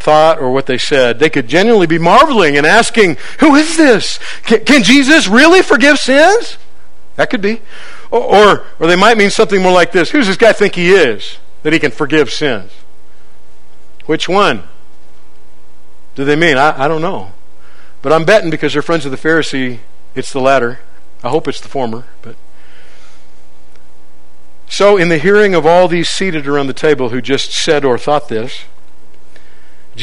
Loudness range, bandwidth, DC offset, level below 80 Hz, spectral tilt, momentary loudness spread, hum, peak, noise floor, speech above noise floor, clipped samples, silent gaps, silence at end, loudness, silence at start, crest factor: 10 LU; 13 kHz; 10%; -44 dBFS; -4 dB/octave; 14 LU; none; 0 dBFS; -48 dBFS; 38 dB; 0.9%; none; 0 s; -10 LUFS; 0 s; 12 dB